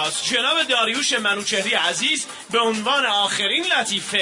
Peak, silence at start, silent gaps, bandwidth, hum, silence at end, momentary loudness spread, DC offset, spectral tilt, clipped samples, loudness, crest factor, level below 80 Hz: -6 dBFS; 0 s; none; 11 kHz; none; 0 s; 3 LU; under 0.1%; -1 dB/octave; under 0.1%; -19 LUFS; 16 dB; -72 dBFS